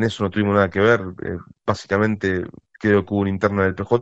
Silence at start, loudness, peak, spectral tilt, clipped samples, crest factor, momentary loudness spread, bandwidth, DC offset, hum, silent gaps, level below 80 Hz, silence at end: 0 s; -20 LUFS; -2 dBFS; -7 dB/octave; under 0.1%; 18 dB; 11 LU; 8.2 kHz; under 0.1%; none; none; -50 dBFS; 0 s